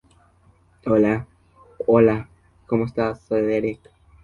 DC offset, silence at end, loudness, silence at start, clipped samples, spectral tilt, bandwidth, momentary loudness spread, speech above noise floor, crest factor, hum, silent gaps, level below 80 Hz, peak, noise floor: under 0.1%; 0.5 s; -21 LUFS; 0.85 s; under 0.1%; -9.5 dB/octave; 7 kHz; 12 LU; 37 dB; 20 dB; none; none; -52 dBFS; -2 dBFS; -57 dBFS